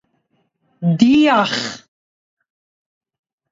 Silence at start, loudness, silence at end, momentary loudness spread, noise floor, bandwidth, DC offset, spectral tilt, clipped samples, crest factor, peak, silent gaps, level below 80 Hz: 0.8 s; -15 LUFS; 1.75 s; 15 LU; -66 dBFS; 7.8 kHz; under 0.1%; -5.5 dB/octave; under 0.1%; 20 dB; 0 dBFS; none; -60 dBFS